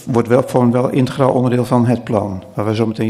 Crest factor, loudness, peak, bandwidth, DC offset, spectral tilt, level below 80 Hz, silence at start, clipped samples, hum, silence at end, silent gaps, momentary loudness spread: 14 dB; -15 LUFS; 0 dBFS; 14 kHz; under 0.1%; -8 dB/octave; -50 dBFS; 0 s; under 0.1%; none; 0 s; none; 6 LU